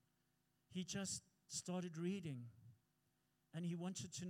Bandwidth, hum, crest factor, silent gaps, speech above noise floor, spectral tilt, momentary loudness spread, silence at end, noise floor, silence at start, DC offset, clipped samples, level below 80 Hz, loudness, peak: 16 kHz; none; 16 dB; none; 37 dB; -4.5 dB/octave; 9 LU; 0 s; -84 dBFS; 0.7 s; under 0.1%; under 0.1%; -86 dBFS; -48 LUFS; -34 dBFS